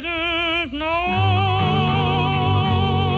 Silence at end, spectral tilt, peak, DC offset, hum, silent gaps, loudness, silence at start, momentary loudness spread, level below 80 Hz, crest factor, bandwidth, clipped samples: 0 s; -7.5 dB/octave; -10 dBFS; under 0.1%; none; none; -19 LUFS; 0 s; 3 LU; -40 dBFS; 10 dB; 6.2 kHz; under 0.1%